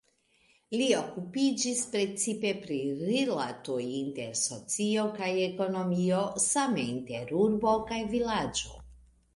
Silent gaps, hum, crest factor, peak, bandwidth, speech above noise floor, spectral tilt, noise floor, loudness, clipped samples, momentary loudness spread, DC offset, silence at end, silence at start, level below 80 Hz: none; none; 18 dB; -12 dBFS; 11.5 kHz; 38 dB; -4 dB/octave; -68 dBFS; -30 LUFS; under 0.1%; 7 LU; under 0.1%; 0.4 s; 0.7 s; -60 dBFS